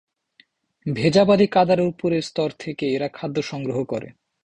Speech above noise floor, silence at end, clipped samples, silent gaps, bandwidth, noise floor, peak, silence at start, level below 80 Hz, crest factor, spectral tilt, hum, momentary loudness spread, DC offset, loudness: 39 dB; 0.35 s; under 0.1%; none; 9.8 kHz; -59 dBFS; -4 dBFS; 0.85 s; -56 dBFS; 18 dB; -6.5 dB/octave; none; 12 LU; under 0.1%; -21 LUFS